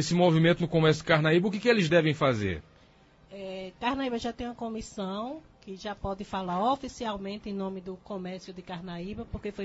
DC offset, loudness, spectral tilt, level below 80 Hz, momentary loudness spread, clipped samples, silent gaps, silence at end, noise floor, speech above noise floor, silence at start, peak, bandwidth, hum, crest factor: under 0.1%; -28 LUFS; -6 dB/octave; -52 dBFS; 17 LU; under 0.1%; none; 0 s; -59 dBFS; 30 dB; 0 s; -10 dBFS; 8 kHz; none; 20 dB